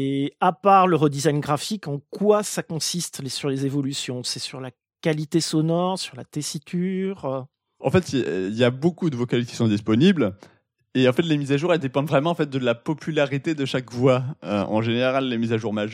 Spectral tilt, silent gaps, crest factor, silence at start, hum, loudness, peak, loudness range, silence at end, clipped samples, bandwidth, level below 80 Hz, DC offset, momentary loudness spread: -5.5 dB/octave; none; 20 dB; 0 s; none; -23 LUFS; -4 dBFS; 4 LU; 0 s; under 0.1%; 16 kHz; -64 dBFS; under 0.1%; 10 LU